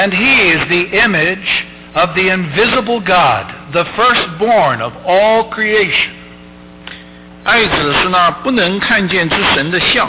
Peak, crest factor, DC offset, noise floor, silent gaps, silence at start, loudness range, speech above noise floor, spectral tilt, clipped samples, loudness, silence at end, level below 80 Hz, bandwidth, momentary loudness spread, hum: -4 dBFS; 10 dB; under 0.1%; -36 dBFS; none; 0 s; 2 LU; 23 dB; -8 dB/octave; under 0.1%; -12 LUFS; 0 s; -40 dBFS; 4 kHz; 7 LU; none